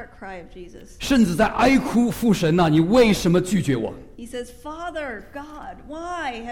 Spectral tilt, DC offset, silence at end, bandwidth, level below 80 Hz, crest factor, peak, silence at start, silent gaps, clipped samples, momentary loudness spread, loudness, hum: -6 dB/octave; 0.3%; 0 s; 16.5 kHz; -42 dBFS; 16 dB; -4 dBFS; 0 s; none; under 0.1%; 21 LU; -20 LUFS; none